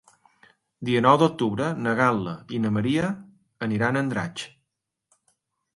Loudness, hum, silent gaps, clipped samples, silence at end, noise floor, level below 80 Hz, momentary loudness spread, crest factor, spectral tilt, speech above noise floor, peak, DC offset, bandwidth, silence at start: -24 LUFS; none; none; under 0.1%; 1.3 s; -81 dBFS; -60 dBFS; 15 LU; 22 dB; -6.5 dB/octave; 58 dB; -4 dBFS; under 0.1%; 11.5 kHz; 0.8 s